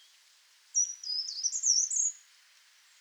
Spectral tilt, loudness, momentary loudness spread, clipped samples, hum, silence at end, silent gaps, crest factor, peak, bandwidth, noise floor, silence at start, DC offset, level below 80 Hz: 11 dB/octave; -28 LUFS; 8 LU; under 0.1%; none; 0.8 s; none; 20 dB; -14 dBFS; over 20 kHz; -63 dBFS; 0.75 s; under 0.1%; under -90 dBFS